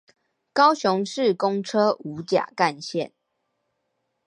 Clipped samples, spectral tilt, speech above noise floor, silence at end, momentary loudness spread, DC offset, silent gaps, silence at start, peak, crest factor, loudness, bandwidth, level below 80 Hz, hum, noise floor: under 0.1%; -5 dB/octave; 54 dB; 1.2 s; 11 LU; under 0.1%; none; 0.55 s; -4 dBFS; 20 dB; -23 LUFS; 11 kHz; -72 dBFS; none; -76 dBFS